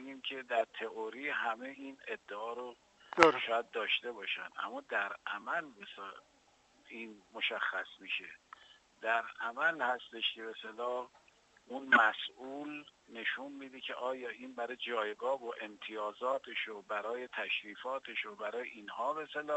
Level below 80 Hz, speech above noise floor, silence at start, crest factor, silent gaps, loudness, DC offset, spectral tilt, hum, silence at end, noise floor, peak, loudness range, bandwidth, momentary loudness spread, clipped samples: -80 dBFS; 31 dB; 0 s; 34 dB; none; -36 LUFS; under 0.1%; -3 dB/octave; none; 0 s; -68 dBFS; -4 dBFS; 7 LU; 8.2 kHz; 15 LU; under 0.1%